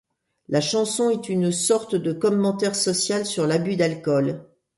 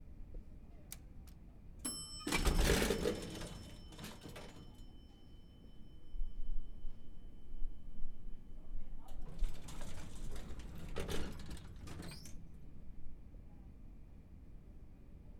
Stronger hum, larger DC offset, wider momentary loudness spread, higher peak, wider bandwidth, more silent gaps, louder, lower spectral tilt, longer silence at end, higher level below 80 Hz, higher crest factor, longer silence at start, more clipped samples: neither; neither; second, 3 LU vs 22 LU; first, -6 dBFS vs -18 dBFS; second, 12 kHz vs 16.5 kHz; neither; first, -22 LUFS vs -44 LUFS; about the same, -4.5 dB/octave vs -4 dB/octave; first, 0.35 s vs 0 s; second, -66 dBFS vs -44 dBFS; about the same, 16 dB vs 20 dB; first, 0.5 s vs 0 s; neither